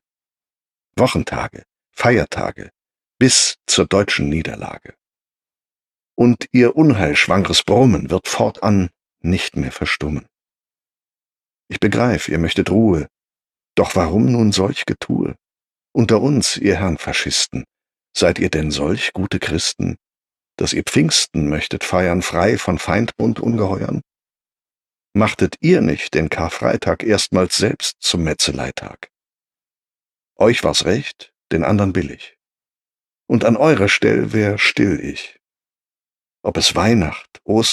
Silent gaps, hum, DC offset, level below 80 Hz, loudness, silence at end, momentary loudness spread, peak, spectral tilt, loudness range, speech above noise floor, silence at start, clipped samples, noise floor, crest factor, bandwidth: none; none; under 0.1%; -40 dBFS; -17 LUFS; 0 s; 12 LU; -2 dBFS; -4.5 dB/octave; 4 LU; over 73 dB; 0.95 s; under 0.1%; under -90 dBFS; 16 dB; 13.5 kHz